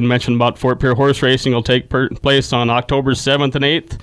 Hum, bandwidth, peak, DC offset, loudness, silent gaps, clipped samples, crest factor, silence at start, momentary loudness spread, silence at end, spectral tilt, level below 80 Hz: none; 11 kHz; -2 dBFS; under 0.1%; -15 LUFS; none; under 0.1%; 14 dB; 0 s; 2 LU; 0 s; -5.5 dB/octave; -36 dBFS